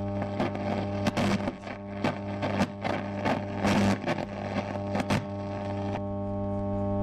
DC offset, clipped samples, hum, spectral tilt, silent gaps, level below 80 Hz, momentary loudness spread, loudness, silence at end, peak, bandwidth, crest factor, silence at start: under 0.1%; under 0.1%; none; -6.5 dB/octave; none; -50 dBFS; 6 LU; -30 LUFS; 0 s; -16 dBFS; 13.5 kHz; 14 dB; 0 s